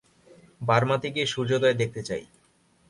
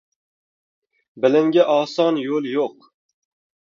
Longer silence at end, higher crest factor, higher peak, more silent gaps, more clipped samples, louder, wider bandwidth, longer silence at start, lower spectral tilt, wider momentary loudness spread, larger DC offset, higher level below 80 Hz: second, 0.65 s vs 0.9 s; about the same, 20 dB vs 20 dB; second, -6 dBFS vs -2 dBFS; neither; neither; second, -26 LUFS vs -19 LUFS; first, 11.5 kHz vs 7.4 kHz; second, 0.6 s vs 1.15 s; about the same, -5 dB/octave vs -6 dB/octave; first, 11 LU vs 8 LU; neither; first, -60 dBFS vs -74 dBFS